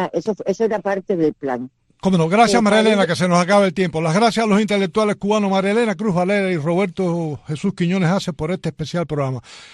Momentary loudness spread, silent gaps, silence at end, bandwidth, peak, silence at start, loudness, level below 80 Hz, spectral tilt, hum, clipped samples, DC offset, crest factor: 10 LU; none; 0.05 s; 12 kHz; -2 dBFS; 0 s; -18 LUFS; -52 dBFS; -6 dB/octave; none; under 0.1%; under 0.1%; 16 dB